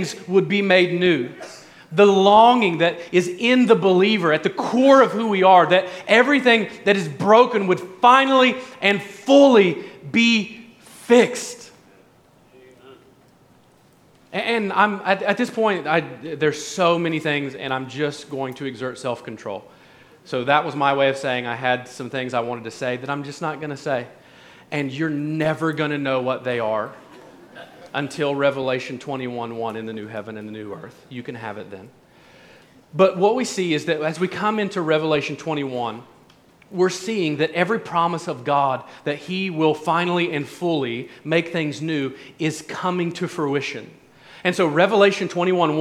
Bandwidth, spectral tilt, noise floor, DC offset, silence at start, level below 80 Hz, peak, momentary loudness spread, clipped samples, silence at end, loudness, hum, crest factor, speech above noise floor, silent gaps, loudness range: 14 kHz; -5 dB/octave; -54 dBFS; under 0.1%; 0 s; -68 dBFS; -2 dBFS; 16 LU; under 0.1%; 0 s; -20 LUFS; none; 18 dB; 35 dB; none; 10 LU